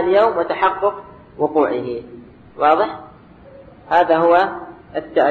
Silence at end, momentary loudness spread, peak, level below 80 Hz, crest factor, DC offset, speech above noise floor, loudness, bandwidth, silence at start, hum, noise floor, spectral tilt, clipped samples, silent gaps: 0 s; 15 LU; -2 dBFS; -54 dBFS; 16 dB; under 0.1%; 26 dB; -17 LUFS; 6.2 kHz; 0 s; none; -43 dBFS; -7 dB/octave; under 0.1%; none